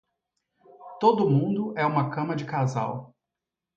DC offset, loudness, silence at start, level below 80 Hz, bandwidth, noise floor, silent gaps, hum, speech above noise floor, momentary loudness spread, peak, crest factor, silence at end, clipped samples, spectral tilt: under 0.1%; -25 LUFS; 0.8 s; -70 dBFS; 7.4 kHz; -87 dBFS; none; none; 63 dB; 10 LU; -6 dBFS; 20 dB; 0.7 s; under 0.1%; -8 dB/octave